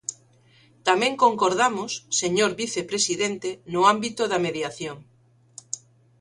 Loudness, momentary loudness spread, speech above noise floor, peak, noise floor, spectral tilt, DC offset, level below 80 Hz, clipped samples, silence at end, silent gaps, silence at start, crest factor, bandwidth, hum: -23 LUFS; 15 LU; 34 dB; -4 dBFS; -57 dBFS; -2.5 dB/octave; under 0.1%; -66 dBFS; under 0.1%; 0.45 s; none; 0.1 s; 20 dB; 11.5 kHz; none